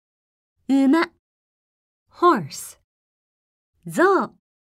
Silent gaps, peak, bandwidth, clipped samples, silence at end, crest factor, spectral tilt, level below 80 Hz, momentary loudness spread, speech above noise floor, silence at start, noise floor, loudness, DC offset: 1.19-2.06 s, 2.84-3.73 s; -6 dBFS; 15.5 kHz; under 0.1%; 0.4 s; 18 dB; -5 dB/octave; -72 dBFS; 17 LU; over 71 dB; 0.7 s; under -90 dBFS; -20 LUFS; under 0.1%